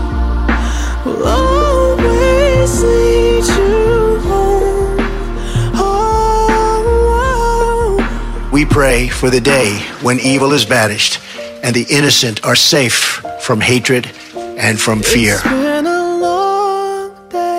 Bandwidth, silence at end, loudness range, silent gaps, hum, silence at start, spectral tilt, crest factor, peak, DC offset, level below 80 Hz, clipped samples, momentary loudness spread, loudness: 16 kHz; 0 s; 2 LU; none; none; 0 s; -4 dB/octave; 12 dB; 0 dBFS; under 0.1%; -20 dBFS; under 0.1%; 8 LU; -12 LUFS